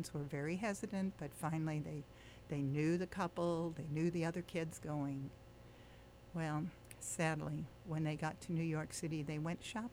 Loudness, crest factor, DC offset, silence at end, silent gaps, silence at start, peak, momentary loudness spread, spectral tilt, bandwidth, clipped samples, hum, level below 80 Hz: -42 LUFS; 16 dB; under 0.1%; 0 s; none; 0 s; -24 dBFS; 13 LU; -6 dB/octave; over 20 kHz; under 0.1%; none; -66 dBFS